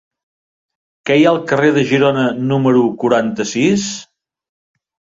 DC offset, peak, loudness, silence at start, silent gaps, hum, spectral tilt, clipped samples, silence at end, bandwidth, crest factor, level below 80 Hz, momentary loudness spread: under 0.1%; -2 dBFS; -14 LUFS; 1.05 s; none; none; -5.5 dB/octave; under 0.1%; 1.1 s; 7.8 kHz; 14 dB; -56 dBFS; 6 LU